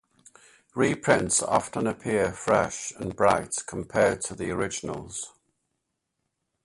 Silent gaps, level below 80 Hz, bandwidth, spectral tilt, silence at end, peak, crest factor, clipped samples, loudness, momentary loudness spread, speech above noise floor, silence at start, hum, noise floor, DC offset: none; -54 dBFS; 11.5 kHz; -4 dB/octave; 1.35 s; -6 dBFS; 22 dB; under 0.1%; -26 LUFS; 12 LU; 54 dB; 0.75 s; none; -80 dBFS; under 0.1%